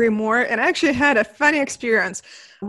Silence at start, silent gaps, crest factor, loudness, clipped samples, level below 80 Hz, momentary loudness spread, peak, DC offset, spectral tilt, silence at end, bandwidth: 0 s; none; 18 dB; -18 LUFS; under 0.1%; -56 dBFS; 5 LU; -2 dBFS; under 0.1%; -3.5 dB/octave; 0 s; 12 kHz